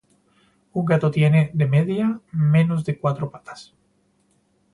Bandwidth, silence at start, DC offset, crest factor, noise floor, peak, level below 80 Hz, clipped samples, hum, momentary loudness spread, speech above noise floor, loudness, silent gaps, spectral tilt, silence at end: 11 kHz; 0.75 s; under 0.1%; 18 dB; -64 dBFS; -4 dBFS; -60 dBFS; under 0.1%; none; 14 LU; 44 dB; -21 LUFS; none; -9 dB/octave; 1.1 s